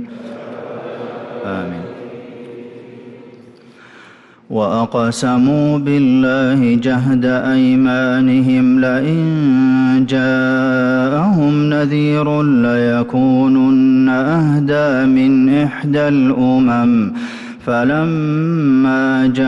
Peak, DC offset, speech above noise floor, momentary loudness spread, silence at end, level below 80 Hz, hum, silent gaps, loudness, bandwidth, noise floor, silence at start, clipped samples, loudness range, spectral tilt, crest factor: -6 dBFS; under 0.1%; 30 dB; 16 LU; 0 s; -50 dBFS; none; none; -13 LUFS; 10 kHz; -43 dBFS; 0 s; under 0.1%; 15 LU; -7.5 dB/octave; 8 dB